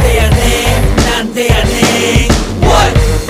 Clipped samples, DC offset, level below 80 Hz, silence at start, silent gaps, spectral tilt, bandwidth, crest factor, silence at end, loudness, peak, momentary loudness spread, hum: 0.4%; under 0.1%; -14 dBFS; 0 s; none; -4.5 dB/octave; 16 kHz; 10 dB; 0 s; -10 LUFS; 0 dBFS; 3 LU; none